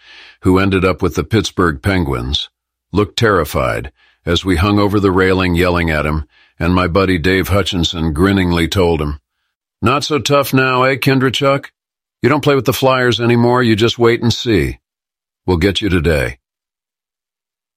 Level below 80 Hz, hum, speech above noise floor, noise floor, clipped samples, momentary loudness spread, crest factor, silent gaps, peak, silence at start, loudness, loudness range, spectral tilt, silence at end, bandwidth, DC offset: -32 dBFS; none; 75 dB; -89 dBFS; under 0.1%; 7 LU; 14 dB; 9.55-9.60 s; 0 dBFS; 0.2 s; -14 LUFS; 3 LU; -5.5 dB/octave; 1.4 s; 16 kHz; under 0.1%